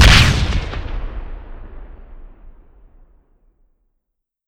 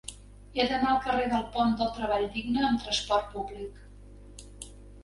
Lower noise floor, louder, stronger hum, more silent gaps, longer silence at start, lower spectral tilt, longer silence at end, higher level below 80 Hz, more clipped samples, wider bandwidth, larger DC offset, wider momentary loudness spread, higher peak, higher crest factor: first, -76 dBFS vs -49 dBFS; first, -16 LUFS vs -28 LUFS; second, none vs 50 Hz at -45 dBFS; neither; about the same, 0 s vs 0.05 s; about the same, -4 dB/octave vs -4 dB/octave; first, 1.95 s vs 0 s; first, -22 dBFS vs -48 dBFS; neither; first, 19.5 kHz vs 11.5 kHz; neither; first, 29 LU vs 19 LU; first, 0 dBFS vs -12 dBFS; about the same, 18 dB vs 18 dB